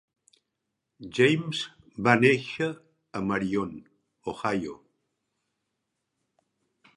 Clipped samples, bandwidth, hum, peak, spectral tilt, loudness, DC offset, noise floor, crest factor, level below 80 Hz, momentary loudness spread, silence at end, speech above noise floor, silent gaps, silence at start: under 0.1%; 11.5 kHz; none; -2 dBFS; -6 dB/octave; -26 LUFS; under 0.1%; -83 dBFS; 26 dB; -64 dBFS; 19 LU; 2.25 s; 57 dB; none; 1 s